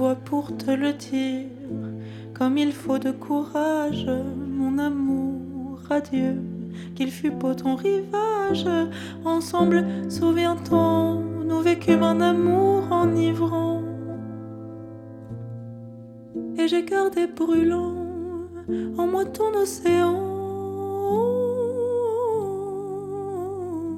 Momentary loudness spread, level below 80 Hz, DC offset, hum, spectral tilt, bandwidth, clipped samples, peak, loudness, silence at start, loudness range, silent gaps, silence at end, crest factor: 14 LU; -60 dBFS; under 0.1%; none; -6.5 dB/octave; 14 kHz; under 0.1%; -6 dBFS; -24 LUFS; 0 s; 6 LU; none; 0 s; 18 dB